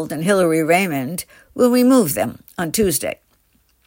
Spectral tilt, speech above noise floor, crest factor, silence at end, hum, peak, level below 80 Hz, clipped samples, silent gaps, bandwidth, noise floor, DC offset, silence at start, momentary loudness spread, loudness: -4.5 dB/octave; 43 dB; 16 dB; 0.7 s; none; -2 dBFS; -48 dBFS; under 0.1%; none; 16.5 kHz; -60 dBFS; under 0.1%; 0 s; 14 LU; -17 LUFS